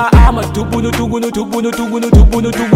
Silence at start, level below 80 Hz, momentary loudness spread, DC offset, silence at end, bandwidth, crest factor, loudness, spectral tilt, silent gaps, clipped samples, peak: 0 s; -14 dBFS; 8 LU; under 0.1%; 0 s; 16 kHz; 10 dB; -13 LUFS; -6.5 dB/octave; none; 0.2%; 0 dBFS